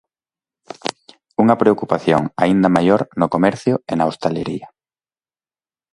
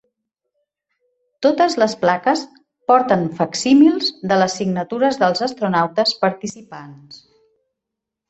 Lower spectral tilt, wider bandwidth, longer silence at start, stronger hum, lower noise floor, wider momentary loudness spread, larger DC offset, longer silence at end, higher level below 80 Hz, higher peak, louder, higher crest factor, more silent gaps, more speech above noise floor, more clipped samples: first, -7 dB/octave vs -5 dB/octave; first, 11.5 kHz vs 8.2 kHz; second, 0.85 s vs 1.4 s; neither; first, under -90 dBFS vs -82 dBFS; second, 13 LU vs 16 LU; neither; about the same, 1.25 s vs 1.15 s; first, -54 dBFS vs -62 dBFS; about the same, 0 dBFS vs -2 dBFS; about the same, -17 LUFS vs -17 LUFS; about the same, 18 dB vs 16 dB; neither; first, over 74 dB vs 65 dB; neither